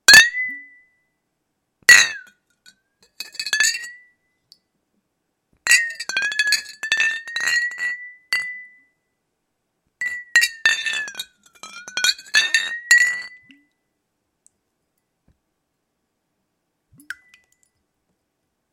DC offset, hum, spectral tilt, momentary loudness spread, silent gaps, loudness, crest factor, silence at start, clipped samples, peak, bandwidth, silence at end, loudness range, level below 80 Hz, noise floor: under 0.1%; none; 2.5 dB/octave; 25 LU; none; -17 LUFS; 22 dB; 0.1 s; under 0.1%; 0 dBFS; 16.5 kHz; 1.6 s; 6 LU; -62 dBFS; -75 dBFS